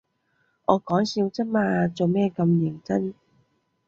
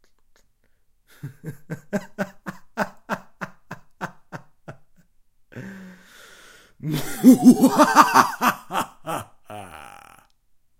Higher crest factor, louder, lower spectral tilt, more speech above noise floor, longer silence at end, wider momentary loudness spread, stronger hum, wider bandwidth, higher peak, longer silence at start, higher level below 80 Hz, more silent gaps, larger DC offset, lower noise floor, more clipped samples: about the same, 22 dB vs 22 dB; second, -24 LUFS vs -19 LUFS; first, -7.5 dB/octave vs -5 dB/octave; first, 47 dB vs 43 dB; second, 0.75 s vs 1 s; second, 5 LU vs 27 LU; neither; second, 7.4 kHz vs 16.5 kHz; second, -4 dBFS vs 0 dBFS; second, 0.7 s vs 1.25 s; second, -62 dBFS vs -56 dBFS; neither; neither; first, -70 dBFS vs -61 dBFS; neither